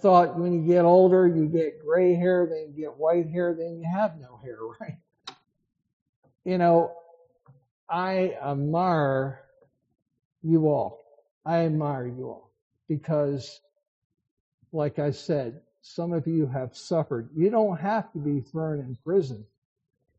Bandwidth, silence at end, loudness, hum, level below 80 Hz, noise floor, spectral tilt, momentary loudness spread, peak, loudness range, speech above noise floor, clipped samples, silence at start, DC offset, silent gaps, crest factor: 7.6 kHz; 0.75 s; -25 LUFS; none; -68 dBFS; -64 dBFS; -7.5 dB/octave; 18 LU; -6 dBFS; 9 LU; 40 dB; under 0.1%; 0.05 s; under 0.1%; 5.93-6.23 s, 7.71-7.87 s, 10.25-10.31 s, 11.31-11.41 s, 12.62-12.71 s, 13.88-14.10 s, 14.31-14.58 s; 20 dB